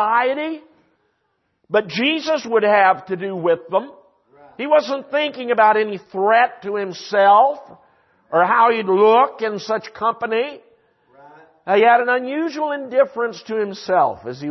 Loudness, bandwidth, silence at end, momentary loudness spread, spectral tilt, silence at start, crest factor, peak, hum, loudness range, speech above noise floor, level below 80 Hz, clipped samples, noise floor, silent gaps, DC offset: -18 LUFS; 6.2 kHz; 0 s; 11 LU; -5 dB/octave; 0 s; 16 dB; -2 dBFS; none; 3 LU; 52 dB; -70 dBFS; under 0.1%; -69 dBFS; none; under 0.1%